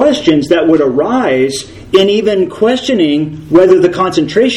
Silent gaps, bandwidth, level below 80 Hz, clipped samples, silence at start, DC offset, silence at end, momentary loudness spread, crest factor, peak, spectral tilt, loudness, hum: none; 12 kHz; -44 dBFS; 0.6%; 0 s; under 0.1%; 0 s; 5 LU; 10 dB; 0 dBFS; -5.5 dB/octave; -11 LUFS; none